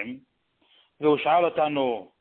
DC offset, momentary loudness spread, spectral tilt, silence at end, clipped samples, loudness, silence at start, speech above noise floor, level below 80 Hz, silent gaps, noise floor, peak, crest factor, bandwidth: under 0.1%; 13 LU; -9.5 dB/octave; 0.15 s; under 0.1%; -24 LUFS; 0 s; 44 dB; -70 dBFS; none; -67 dBFS; -10 dBFS; 16 dB; 4.3 kHz